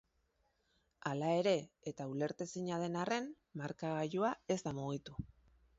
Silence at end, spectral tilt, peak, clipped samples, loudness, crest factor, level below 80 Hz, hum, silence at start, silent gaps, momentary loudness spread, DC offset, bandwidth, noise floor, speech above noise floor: 0.5 s; -5.5 dB/octave; -20 dBFS; under 0.1%; -39 LUFS; 20 dB; -68 dBFS; none; 1.05 s; none; 12 LU; under 0.1%; 7.6 kHz; -79 dBFS; 40 dB